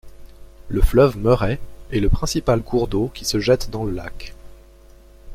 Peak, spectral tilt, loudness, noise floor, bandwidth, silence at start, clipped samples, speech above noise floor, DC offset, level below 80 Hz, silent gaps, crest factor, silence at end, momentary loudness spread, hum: -2 dBFS; -6 dB/octave; -20 LUFS; -46 dBFS; 16 kHz; 0.05 s; under 0.1%; 27 dB; under 0.1%; -28 dBFS; none; 18 dB; 0 s; 14 LU; none